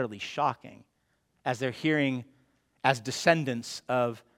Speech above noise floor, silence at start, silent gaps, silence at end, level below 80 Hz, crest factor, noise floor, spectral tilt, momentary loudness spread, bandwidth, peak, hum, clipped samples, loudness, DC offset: 45 dB; 0 s; none; 0.2 s; -72 dBFS; 24 dB; -74 dBFS; -5 dB/octave; 10 LU; 16.5 kHz; -6 dBFS; none; under 0.1%; -29 LUFS; under 0.1%